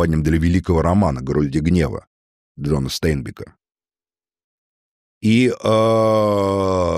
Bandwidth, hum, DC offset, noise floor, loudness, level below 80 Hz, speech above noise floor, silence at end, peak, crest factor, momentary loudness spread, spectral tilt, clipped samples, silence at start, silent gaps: 15.5 kHz; none; under 0.1%; under -90 dBFS; -18 LUFS; -34 dBFS; over 73 dB; 0 s; -4 dBFS; 14 dB; 9 LU; -7 dB/octave; under 0.1%; 0 s; 2.07-2.55 s, 4.44-5.21 s